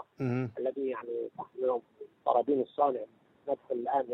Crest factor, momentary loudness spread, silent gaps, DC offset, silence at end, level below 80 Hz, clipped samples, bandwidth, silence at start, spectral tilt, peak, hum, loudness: 20 dB; 12 LU; none; under 0.1%; 0 s; -76 dBFS; under 0.1%; 6 kHz; 0 s; -9.5 dB/octave; -12 dBFS; none; -33 LUFS